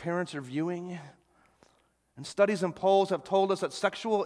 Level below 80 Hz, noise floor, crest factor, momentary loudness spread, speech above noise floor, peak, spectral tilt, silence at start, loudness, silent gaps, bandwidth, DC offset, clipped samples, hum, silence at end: -74 dBFS; -69 dBFS; 20 dB; 14 LU; 41 dB; -10 dBFS; -5.5 dB/octave; 0 s; -29 LUFS; none; 11 kHz; under 0.1%; under 0.1%; none; 0 s